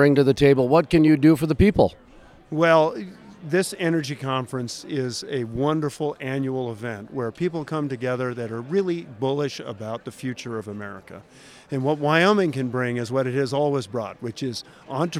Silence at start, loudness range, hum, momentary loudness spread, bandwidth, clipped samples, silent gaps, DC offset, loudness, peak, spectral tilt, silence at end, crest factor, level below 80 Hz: 0 s; 8 LU; none; 15 LU; 15 kHz; under 0.1%; none; under 0.1%; -23 LUFS; -4 dBFS; -6.5 dB/octave; 0 s; 18 dB; -46 dBFS